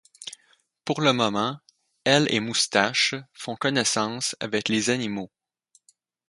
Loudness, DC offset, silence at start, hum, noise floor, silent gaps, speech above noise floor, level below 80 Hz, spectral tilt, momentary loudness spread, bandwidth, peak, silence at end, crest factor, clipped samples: -24 LUFS; under 0.1%; 0.2 s; none; -65 dBFS; none; 41 dB; -66 dBFS; -3 dB/octave; 17 LU; 11.5 kHz; -2 dBFS; 1.05 s; 24 dB; under 0.1%